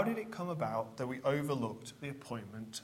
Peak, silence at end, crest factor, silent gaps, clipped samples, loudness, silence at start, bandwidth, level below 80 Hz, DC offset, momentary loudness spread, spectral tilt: -18 dBFS; 0 s; 20 dB; none; under 0.1%; -38 LUFS; 0 s; 16 kHz; -72 dBFS; under 0.1%; 10 LU; -6 dB/octave